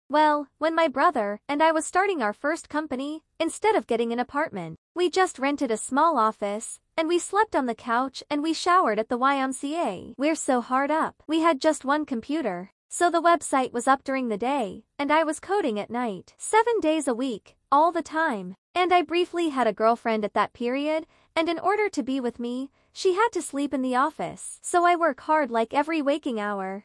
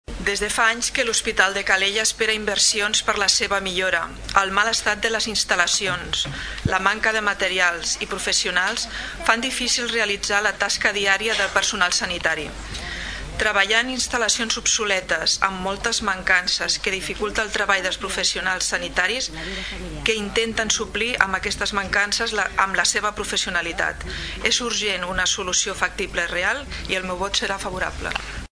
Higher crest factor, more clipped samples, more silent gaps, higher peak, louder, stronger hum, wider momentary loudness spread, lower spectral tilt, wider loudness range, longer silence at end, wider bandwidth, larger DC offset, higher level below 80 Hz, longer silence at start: about the same, 18 dB vs 22 dB; neither; first, 4.78-4.95 s, 12.72-12.89 s, 18.58-18.74 s vs none; second, -8 dBFS vs 0 dBFS; second, -25 LUFS vs -21 LUFS; neither; about the same, 9 LU vs 7 LU; first, -3.5 dB/octave vs -1 dB/octave; about the same, 2 LU vs 3 LU; about the same, 0.05 s vs 0.1 s; about the same, 12 kHz vs 11 kHz; neither; second, -66 dBFS vs -40 dBFS; about the same, 0.1 s vs 0.1 s